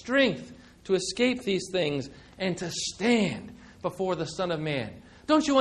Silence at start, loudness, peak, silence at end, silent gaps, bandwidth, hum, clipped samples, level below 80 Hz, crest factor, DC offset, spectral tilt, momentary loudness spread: 0.05 s; -28 LUFS; -8 dBFS; 0 s; none; 12.5 kHz; none; under 0.1%; -58 dBFS; 20 dB; under 0.1%; -4.5 dB/octave; 16 LU